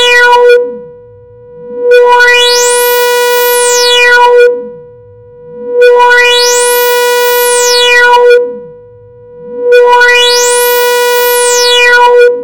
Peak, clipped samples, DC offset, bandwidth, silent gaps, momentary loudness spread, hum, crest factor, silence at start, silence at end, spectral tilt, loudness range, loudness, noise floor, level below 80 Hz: 0 dBFS; 0.9%; 1%; 17.5 kHz; none; 12 LU; none; 6 dB; 0 s; 0 s; 1.5 dB/octave; 2 LU; -4 LUFS; -33 dBFS; -46 dBFS